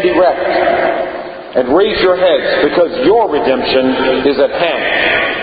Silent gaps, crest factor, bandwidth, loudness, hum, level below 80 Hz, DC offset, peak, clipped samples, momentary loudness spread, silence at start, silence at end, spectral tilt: none; 12 dB; 5 kHz; -12 LUFS; none; -42 dBFS; under 0.1%; 0 dBFS; under 0.1%; 5 LU; 0 s; 0 s; -8.5 dB/octave